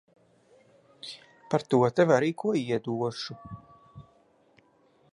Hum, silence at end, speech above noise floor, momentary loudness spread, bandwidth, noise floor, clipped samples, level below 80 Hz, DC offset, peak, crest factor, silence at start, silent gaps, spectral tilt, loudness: none; 1.15 s; 38 dB; 22 LU; 11 kHz; -64 dBFS; under 0.1%; -68 dBFS; under 0.1%; -6 dBFS; 22 dB; 1.05 s; none; -6.5 dB/octave; -27 LUFS